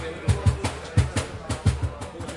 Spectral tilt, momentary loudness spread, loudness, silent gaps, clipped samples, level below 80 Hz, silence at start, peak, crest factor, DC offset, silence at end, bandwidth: -5.5 dB/octave; 8 LU; -26 LUFS; none; under 0.1%; -36 dBFS; 0 s; -8 dBFS; 18 dB; under 0.1%; 0 s; 11.5 kHz